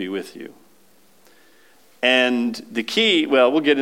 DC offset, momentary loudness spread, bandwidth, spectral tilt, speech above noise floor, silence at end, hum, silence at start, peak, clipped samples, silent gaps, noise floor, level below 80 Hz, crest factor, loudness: 0.2%; 19 LU; 16.5 kHz; -3.5 dB/octave; 38 dB; 0 s; none; 0 s; -4 dBFS; under 0.1%; none; -57 dBFS; -78 dBFS; 18 dB; -18 LUFS